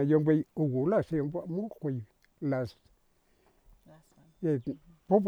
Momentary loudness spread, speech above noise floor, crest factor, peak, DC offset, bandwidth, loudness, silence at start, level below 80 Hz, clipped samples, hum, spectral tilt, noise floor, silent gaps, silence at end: 13 LU; 39 dB; 20 dB; -12 dBFS; under 0.1%; 6.8 kHz; -31 LUFS; 0 s; -64 dBFS; under 0.1%; none; -10 dB/octave; -69 dBFS; none; 0 s